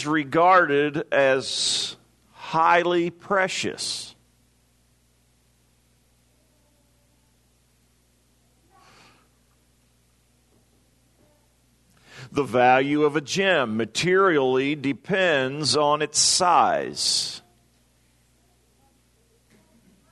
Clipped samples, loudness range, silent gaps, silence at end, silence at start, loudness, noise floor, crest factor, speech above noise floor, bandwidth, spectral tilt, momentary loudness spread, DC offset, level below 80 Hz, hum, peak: under 0.1%; 10 LU; none; 2.7 s; 0 s; -21 LUFS; -63 dBFS; 20 dB; 42 dB; 12.5 kHz; -3 dB/octave; 11 LU; under 0.1%; -66 dBFS; 60 Hz at -65 dBFS; -4 dBFS